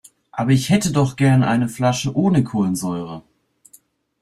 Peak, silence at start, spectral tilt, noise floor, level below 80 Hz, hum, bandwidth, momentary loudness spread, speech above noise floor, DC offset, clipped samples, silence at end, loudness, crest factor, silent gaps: -4 dBFS; 0.35 s; -6 dB/octave; -53 dBFS; -52 dBFS; none; 14 kHz; 12 LU; 36 dB; under 0.1%; under 0.1%; 1 s; -18 LUFS; 16 dB; none